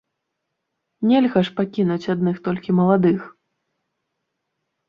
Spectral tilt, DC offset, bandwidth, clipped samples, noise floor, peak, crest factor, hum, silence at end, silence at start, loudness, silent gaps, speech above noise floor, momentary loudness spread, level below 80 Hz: -9 dB/octave; under 0.1%; 6.8 kHz; under 0.1%; -78 dBFS; -4 dBFS; 18 dB; none; 1.6 s; 1 s; -20 LUFS; none; 59 dB; 7 LU; -62 dBFS